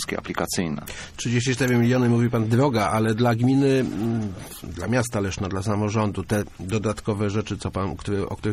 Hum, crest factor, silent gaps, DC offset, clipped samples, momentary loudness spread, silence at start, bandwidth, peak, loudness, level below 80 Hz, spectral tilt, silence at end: none; 16 dB; none; under 0.1%; under 0.1%; 9 LU; 0 s; 15.5 kHz; -6 dBFS; -23 LUFS; -46 dBFS; -6 dB/octave; 0 s